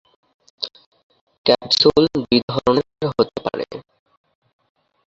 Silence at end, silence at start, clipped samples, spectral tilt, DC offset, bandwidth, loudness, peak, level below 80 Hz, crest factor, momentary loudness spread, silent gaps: 1.25 s; 0.6 s; under 0.1%; -5.5 dB/octave; under 0.1%; 7.8 kHz; -19 LUFS; -2 dBFS; -52 dBFS; 20 dB; 15 LU; 0.86-0.92 s, 1.03-1.10 s, 1.21-1.27 s, 1.38-1.44 s, 2.43-2.48 s